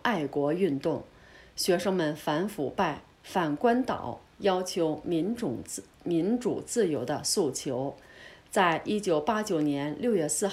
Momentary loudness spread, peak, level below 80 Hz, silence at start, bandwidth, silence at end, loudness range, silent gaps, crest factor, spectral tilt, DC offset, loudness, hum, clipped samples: 11 LU; -12 dBFS; -62 dBFS; 0.05 s; 16 kHz; 0 s; 1 LU; none; 18 dB; -4.5 dB/octave; under 0.1%; -29 LUFS; none; under 0.1%